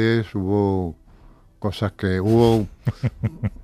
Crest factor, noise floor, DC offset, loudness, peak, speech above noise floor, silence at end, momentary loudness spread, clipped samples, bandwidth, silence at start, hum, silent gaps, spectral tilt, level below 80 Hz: 18 dB; -49 dBFS; under 0.1%; -22 LUFS; -2 dBFS; 28 dB; 0 s; 11 LU; under 0.1%; 14 kHz; 0 s; none; none; -8 dB/octave; -42 dBFS